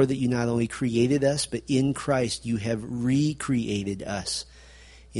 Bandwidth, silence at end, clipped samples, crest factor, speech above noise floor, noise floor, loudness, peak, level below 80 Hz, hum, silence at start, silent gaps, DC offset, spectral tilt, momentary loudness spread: 11.5 kHz; 0 s; under 0.1%; 18 dB; 24 dB; -49 dBFS; -26 LUFS; -8 dBFS; -52 dBFS; none; 0 s; none; under 0.1%; -5.5 dB/octave; 7 LU